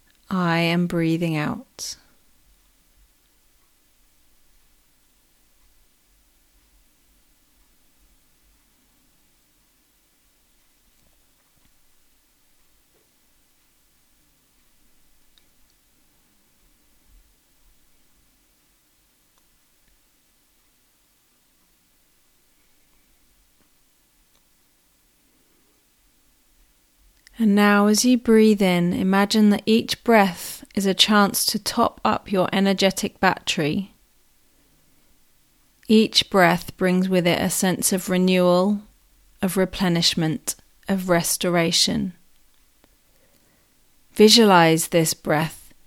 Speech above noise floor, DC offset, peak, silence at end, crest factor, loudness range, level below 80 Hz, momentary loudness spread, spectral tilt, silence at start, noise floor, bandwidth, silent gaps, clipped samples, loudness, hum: 43 dB; under 0.1%; 0 dBFS; 0.3 s; 24 dB; 7 LU; -56 dBFS; 13 LU; -4 dB/octave; 0.3 s; -62 dBFS; 17 kHz; none; under 0.1%; -19 LUFS; none